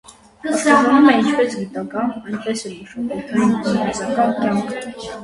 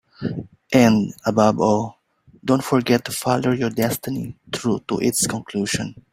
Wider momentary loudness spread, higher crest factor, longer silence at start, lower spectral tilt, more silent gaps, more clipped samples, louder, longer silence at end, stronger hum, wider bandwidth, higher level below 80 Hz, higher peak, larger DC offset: first, 15 LU vs 12 LU; about the same, 18 dB vs 20 dB; about the same, 0.1 s vs 0.2 s; about the same, -5 dB/octave vs -5 dB/octave; neither; neither; first, -18 LUFS vs -21 LUFS; second, 0 s vs 0.15 s; neither; second, 11.5 kHz vs 16 kHz; about the same, -54 dBFS vs -54 dBFS; about the same, -2 dBFS vs -2 dBFS; neither